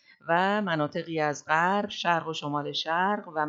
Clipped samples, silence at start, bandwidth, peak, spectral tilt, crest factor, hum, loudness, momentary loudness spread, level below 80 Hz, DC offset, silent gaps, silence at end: under 0.1%; 0.25 s; 7.8 kHz; -10 dBFS; -4.5 dB/octave; 18 dB; none; -27 LUFS; 6 LU; -78 dBFS; under 0.1%; none; 0 s